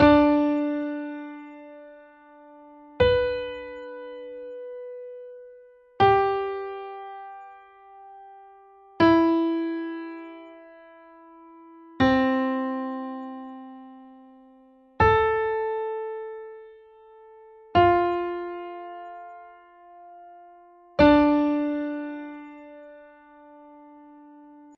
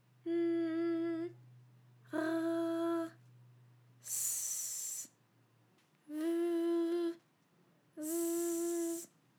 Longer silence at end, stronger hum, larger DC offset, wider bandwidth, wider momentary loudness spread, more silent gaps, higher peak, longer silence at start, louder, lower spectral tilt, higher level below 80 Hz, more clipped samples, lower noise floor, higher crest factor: first, 1.75 s vs 0.3 s; neither; neither; second, 6.2 kHz vs over 20 kHz; first, 25 LU vs 12 LU; neither; first, -4 dBFS vs -24 dBFS; second, 0 s vs 0.25 s; first, -23 LUFS vs -37 LUFS; first, -8 dB/octave vs -3.5 dB/octave; first, -50 dBFS vs under -90 dBFS; neither; second, -55 dBFS vs -71 dBFS; first, 22 dB vs 14 dB